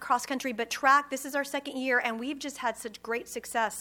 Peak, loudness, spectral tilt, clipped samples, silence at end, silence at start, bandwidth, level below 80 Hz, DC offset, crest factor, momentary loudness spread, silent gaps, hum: -10 dBFS; -29 LUFS; -1.5 dB/octave; under 0.1%; 0 s; 0 s; 19.5 kHz; -70 dBFS; under 0.1%; 20 dB; 11 LU; none; none